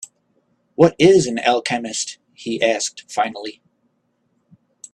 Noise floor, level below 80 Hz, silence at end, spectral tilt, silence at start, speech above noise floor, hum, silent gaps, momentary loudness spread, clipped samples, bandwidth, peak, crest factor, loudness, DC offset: -67 dBFS; -58 dBFS; 1.45 s; -4 dB/octave; 0 s; 50 dB; none; none; 19 LU; under 0.1%; 11.5 kHz; 0 dBFS; 20 dB; -18 LUFS; under 0.1%